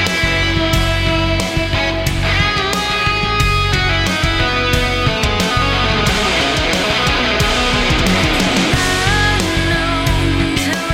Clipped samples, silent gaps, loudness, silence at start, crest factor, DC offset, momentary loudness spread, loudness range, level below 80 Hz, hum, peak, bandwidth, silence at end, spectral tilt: under 0.1%; none; -14 LUFS; 0 s; 14 dB; under 0.1%; 2 LU; 1 LU; -24 dBFS; none; 0 dBFS; 16.5 kHz; 0 s; -4 dB/octave